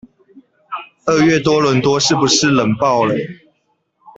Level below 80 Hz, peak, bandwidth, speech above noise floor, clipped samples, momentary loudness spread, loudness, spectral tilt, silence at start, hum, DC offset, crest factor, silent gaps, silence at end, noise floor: -52 dBFS; -2 dBFS; 8.4 kHz; 52 dB; under 0.1%; 17 LU; -14 LUFS; -4 dB/octave; 0.7 s; none; under 0.1%; 14 dB; none; 0.85 s; -65 dBFS